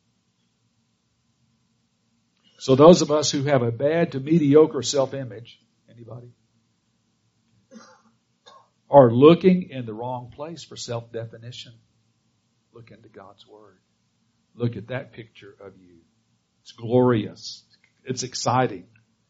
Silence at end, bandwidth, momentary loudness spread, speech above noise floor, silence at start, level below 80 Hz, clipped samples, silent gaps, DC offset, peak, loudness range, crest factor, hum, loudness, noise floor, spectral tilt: 0.5 s; 8 kHz; 26 LU; 48 dB; 2.6 s; -62 dBFS; under 0.1%; none; under 0.1%; 0 dBFS; 18 LU; 24 dB; none; -20 LUFS; -69 dBFS; -6 dB/octave